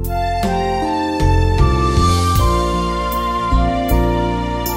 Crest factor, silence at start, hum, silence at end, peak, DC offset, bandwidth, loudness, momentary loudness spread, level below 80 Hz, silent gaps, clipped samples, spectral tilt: 14 dB; 0 s; none; 0 s; 0 dBFS; under 0.1%; 16.5 kHz; -17 LUFS; 5 LU; -20 dBFS; none; under 0.1%; -6 dB/octave